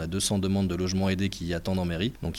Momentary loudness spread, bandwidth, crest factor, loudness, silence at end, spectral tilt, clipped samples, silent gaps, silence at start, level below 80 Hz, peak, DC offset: 4 LU; 15.5 kHz; 14 dB; -28 LUFS; 0 s; -5 dB/octave; under 0.1%; none; 0 s; -46 dBFS; -14 dBFS; under 0.1%